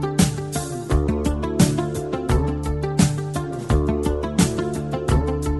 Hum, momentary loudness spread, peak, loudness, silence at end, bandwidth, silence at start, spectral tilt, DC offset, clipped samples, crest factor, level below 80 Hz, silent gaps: none; 7 LU; -2 dBFS; -22 LUFS; 0 s; 12 kHz; 0 s; -6 dB/octave; 0.2%; under 0.1%; 18 dB; -28 dBFS; none